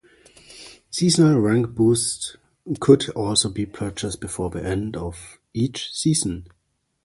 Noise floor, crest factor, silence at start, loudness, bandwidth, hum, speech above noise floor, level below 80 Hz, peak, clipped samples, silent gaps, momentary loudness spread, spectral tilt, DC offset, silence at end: -51 dBFS; 20 dB; 0.5 s; -21 LUFS; 11.5 kHz; none; 30 dB; -46 dBFS; -2 dBFS; under 0.1%; none; 17 LU; -5 dB/octave; under 0.1%; 0.6 s